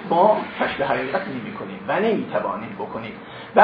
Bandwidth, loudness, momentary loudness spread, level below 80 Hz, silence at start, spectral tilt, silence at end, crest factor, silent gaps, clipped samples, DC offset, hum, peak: 5.2 kHz; -23 LUFS; 14 LU; -60 dBFS; 0 s; -8.5 dB/octave; 0 s; 22 dB; none; under 0.1%; under 0.1%; none; 0 dBFS